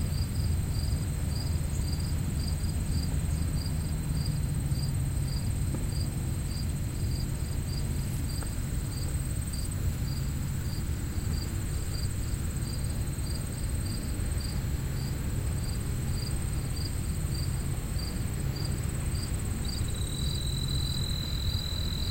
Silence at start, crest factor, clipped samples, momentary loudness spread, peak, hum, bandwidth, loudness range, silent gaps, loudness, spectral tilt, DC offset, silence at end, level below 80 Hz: 0 s; 14 dB; under 0.1%; 3 LU; -16 dBFS; none; 16 kHz; 2 LU; none; -32 LUFS; -5 dB/octave; under 0.1%; 0 s; -34 dBFS